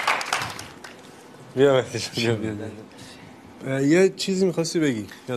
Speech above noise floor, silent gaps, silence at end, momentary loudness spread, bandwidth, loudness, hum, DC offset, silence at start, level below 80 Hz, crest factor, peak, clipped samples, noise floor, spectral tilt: 22 dB; none; 0 s; 23 LU; 13 kHz; -23 LUFS; none; under 0.1%; 0 s; -64 dBFS; 20 dB; -4 dBFS; under 0.1%; -45 dBFS; -5 dB/octave